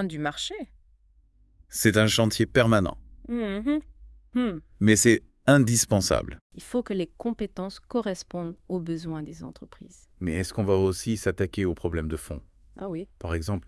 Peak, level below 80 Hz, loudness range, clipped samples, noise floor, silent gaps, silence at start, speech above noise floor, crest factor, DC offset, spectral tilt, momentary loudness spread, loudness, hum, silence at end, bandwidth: -4 dBFS; -48 dBFS; 9 LU; under 0.1%; -60 dBFS; 6.41-6.50 s; 0 s; 34 dB; 22 dB; under 0.1%; -4.5 dB/octave; 16 LU; -26 LUFS; none; 0.05 s; 12 kHz